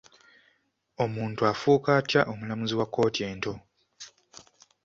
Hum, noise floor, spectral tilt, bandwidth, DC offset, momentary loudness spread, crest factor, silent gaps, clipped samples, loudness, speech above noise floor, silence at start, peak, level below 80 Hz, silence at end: none; -70 dBFS; -5.5 dB/octave; 7.6 kHz; under 0.1%; 22 LU; 22 dB; none; under 0.1%; -27 LUFS; 44 dB; 1 s; -6 dBFS; -62 dBFS; 0.75 s